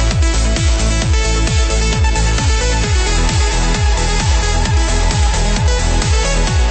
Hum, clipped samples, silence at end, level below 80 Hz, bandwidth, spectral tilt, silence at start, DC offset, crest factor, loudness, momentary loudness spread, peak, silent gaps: none; under 0.1%; 0 s; -14 dBFS; 8.8 kHz; -4 dB/octave; 0 s; under 0.1%; 10 dB; -15 LUFS; 1 LU; -4 dBFS; none